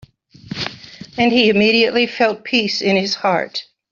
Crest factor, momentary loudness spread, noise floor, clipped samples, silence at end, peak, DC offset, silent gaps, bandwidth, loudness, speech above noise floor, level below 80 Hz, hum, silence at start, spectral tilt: 16 dB; 15 LU; -37 dBFS; under 0.1%; 0.3 s; -2 dBFS; under 0.1%; none; 7.4 kHz; -16 LUFS; 21 dB; -56 dBFS; none; 0.45 s; -4.5 dB/octave